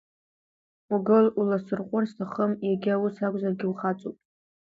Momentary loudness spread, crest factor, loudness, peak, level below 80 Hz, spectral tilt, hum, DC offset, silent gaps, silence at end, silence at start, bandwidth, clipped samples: 9 LU; 18 dB; -26 LUFS; -8 dBFS; -72 dBFS; -9.5 dB/octave; none; under 0.1%; none; 0.55 s; 0.9 s; 7.2 kHz; under 0.1%